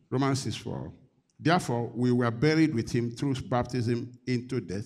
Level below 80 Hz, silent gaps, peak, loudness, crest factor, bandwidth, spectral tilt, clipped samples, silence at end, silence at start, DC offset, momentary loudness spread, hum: -56 dBFS; none; -12 dBFS; -28 LUFS; 18 dB; 13.5 kHz; -6.5 dB/octave; under 0.1%; 0 s; 0.1 s; under 0.1%; 9 LU; none